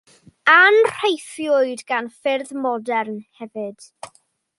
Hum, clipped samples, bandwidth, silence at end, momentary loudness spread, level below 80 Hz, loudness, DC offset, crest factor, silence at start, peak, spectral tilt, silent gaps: none; under 0.1%; 11.5 kHz; 0.55 s; 21 LU; -72 dBFS; -18 LUFS; under 0.1%; 18 dB; 0.45 s; -2 dBFS; -3 dB/octave; none